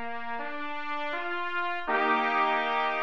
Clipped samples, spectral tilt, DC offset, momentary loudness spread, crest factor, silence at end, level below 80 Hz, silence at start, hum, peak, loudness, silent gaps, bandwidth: under 0.1%; -4 dB/octave; 1%; 10 LU; 16 dB; 0 s; -66 dBFS; 0 s; none; -12 dBFS; -29 LUFS; none; 7.4 kHz